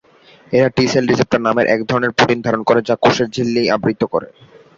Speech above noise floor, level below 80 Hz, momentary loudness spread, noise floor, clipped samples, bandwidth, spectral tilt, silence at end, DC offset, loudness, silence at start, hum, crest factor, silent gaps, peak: 32 dB; -50 dBFS; 4 LU; -47 dBFS; under 0.1%; 7.8 kHz; -5.5 dB/octave; 0.5 s; under 0.1%; -16 LUFS; 0.5 s; none; 16 dB; none; 0 dBFS